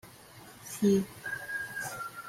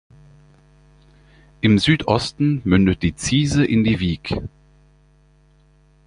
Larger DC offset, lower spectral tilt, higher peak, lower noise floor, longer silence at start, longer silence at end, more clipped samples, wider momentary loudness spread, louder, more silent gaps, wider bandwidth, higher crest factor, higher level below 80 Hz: neither; about the same, -5.5 dB/octave vs -5.5 dB/octave; second, -16 dBFS vs -2 dBFS; about the same, -52 dBFS vs -54 dBFS; second, 0.05 s vs 1.65 s; second, 0 s vs 1.6 s; neither; first, 23 LU vs 9 LU; second, -32 LUFS vs -19 LUFS; neither; first, 16.5 kHz vs 10.5 kHz; about the same, 18 dB vs 20 dB; second, -68 dBFS vs -40 dBFS